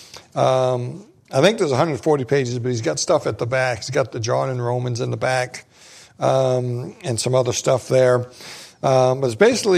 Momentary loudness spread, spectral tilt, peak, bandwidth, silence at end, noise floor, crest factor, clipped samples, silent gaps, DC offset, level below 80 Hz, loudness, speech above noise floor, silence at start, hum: 10 LU; -5 dB/octave; -2 dBFS; 14.5 kHz; 0 s; -46 dBFS; 18 dB; under 0.1%; none; under 0.1%; -60 dBFS; -20 LUFS; 27 dB; 0 s; none